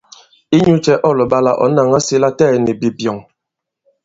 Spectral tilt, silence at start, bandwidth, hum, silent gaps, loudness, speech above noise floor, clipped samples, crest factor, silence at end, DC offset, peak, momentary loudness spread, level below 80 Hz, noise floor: -6 dB/octave; 0.5 s; 8 kHz; none; none; -13 LUFS; 67 dB; under 0.1%; 14 dB; 0.85 s; under 0.1%; 0 dBFS; 7 LU; -50 dBFS; -80 dBFS